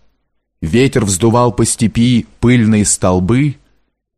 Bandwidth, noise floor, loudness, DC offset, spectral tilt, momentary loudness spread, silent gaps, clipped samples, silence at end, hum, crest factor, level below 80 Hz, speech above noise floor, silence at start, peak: 15 kHz; -64 dBFS; -12 LUFS; under 0.1%; -5.5 dB/octave; 4 LU; none; under 0.1%; 0.65 s; none; 12 dB; -36 dBFS; 53 dB; 0.6 s; 0 dBFS